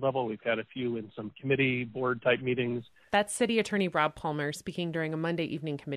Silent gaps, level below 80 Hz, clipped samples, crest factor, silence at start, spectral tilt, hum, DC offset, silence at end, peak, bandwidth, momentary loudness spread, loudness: none; -66 dBFS; under 0.1%; 18 dB; 0 s; -5 dB/octave; none; under 0.1%; 0 s; -12 dBFS; 13 kHz; 8 LU; -30 LUFS